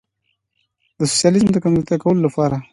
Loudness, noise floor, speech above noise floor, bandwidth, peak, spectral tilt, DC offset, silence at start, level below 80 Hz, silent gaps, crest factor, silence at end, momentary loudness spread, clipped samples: -17 LUFS; -71 dBFS; 55 dB; 11.5 kHz; -2 dBFS; -5.5 dB/octave; under 0.1%; 1 s; -50 dBFS; none; 16 dB; 0.1 s; 5 LU; under 0.1%